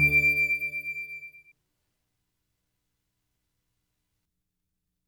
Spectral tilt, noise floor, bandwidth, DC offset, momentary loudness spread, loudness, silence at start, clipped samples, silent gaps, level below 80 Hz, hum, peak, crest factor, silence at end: -5 dB/octave; -82 dBFS; over 20 kHz; under 0.1%; 21 LU; -24 LUFS; 0 s; under 0.1%; none; -54 dBFS; none; -12 dBFS; 20 dB; 3.7 s